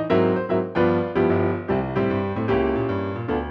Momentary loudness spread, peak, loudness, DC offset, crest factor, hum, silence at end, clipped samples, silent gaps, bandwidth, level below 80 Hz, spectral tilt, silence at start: 5 LU; -8 dBFS; -22 LUFS; under 0.1%; 14 dB; none; 0 s; under 0.1%; none; 6 kHz; -42 dBFS; -9.5 dB/octave; 0 s